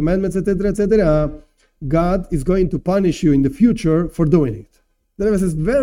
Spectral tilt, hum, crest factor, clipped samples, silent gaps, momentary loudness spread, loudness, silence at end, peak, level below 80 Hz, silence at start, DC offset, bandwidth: -8 dB/octave; none; 16 dB; under 0.1%; none; 6 LU; -17 LUFS; 0 s; -2 dBFS; -30 dBFS; 0 s; under 0.1%; 15 kHz